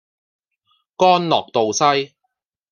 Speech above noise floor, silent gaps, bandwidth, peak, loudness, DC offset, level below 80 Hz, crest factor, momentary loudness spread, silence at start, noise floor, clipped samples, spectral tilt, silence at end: 58 dB; none; 10.5 kHz; -2 dBFS; -17 LUFS; under 0.1%; -68 dBFS; 18 dB; 7 LU; 1 s; -75 dBFS; under 0.1%; -3.5 dB/octave; 0.65 s